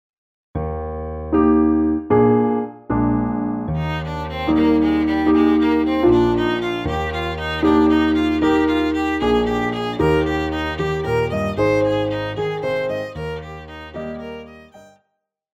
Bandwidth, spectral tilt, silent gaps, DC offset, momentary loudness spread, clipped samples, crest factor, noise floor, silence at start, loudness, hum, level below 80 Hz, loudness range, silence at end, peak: 8 kHz; -7.5 dB/octave; none; under 0.1%; 13 LU; under 0.1%; 14 dB; -74 dBFS; 0.55 s; -19 LUFS; none; -36 dBFS; 5 LU; 0.75 s; -4 dBFS